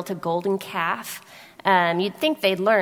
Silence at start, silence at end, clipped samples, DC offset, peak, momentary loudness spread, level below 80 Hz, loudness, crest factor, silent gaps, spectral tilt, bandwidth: 0 s; 0 s; under 0.1%; under 0.1%; -4 dBFS; 10 LU; -74 dBFS; -23 LUFS; 20 dB; none; -4.5 dB/octave; 16 kHz